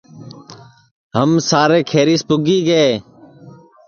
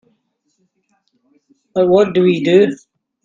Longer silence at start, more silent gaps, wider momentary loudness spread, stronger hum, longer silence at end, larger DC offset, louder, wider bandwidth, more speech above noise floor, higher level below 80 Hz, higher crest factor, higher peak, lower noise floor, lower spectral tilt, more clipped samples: second, 0.15 s vs 1.75 s; first, 0.91-1.10 s vs none; about the same, 9 LU vs 10 LU; neither; about the same, 0.4 s vs 0.5 s; neither; about the same, -15 LUFS vs -14 LUFS; about the same, 7.2 kHz vs 7.4 kHz; second, 28 dB vs 54 dB; about the same, -56 dBFS vs -60 dBFS; about the same, 16 dB vs 16 dB; about the same, 0 dBFS vs 0 dBFS; second, -42 dBFS vs -66 dBFS; second, -5 dB/octave vs -7 dB/octave; neither